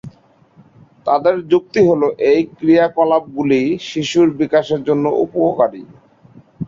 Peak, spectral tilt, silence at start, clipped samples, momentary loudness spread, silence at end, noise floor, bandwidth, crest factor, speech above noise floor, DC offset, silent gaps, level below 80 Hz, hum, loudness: -2 dBFS; -6.5 dB/octave; 0.05 s; under 0.1%; 5 LU; 0 s; -50 dBFS; 7.6 kHz; 14 dB; 35 dB; under 0.1%; none; -56 dBFS; none; -15 LUFS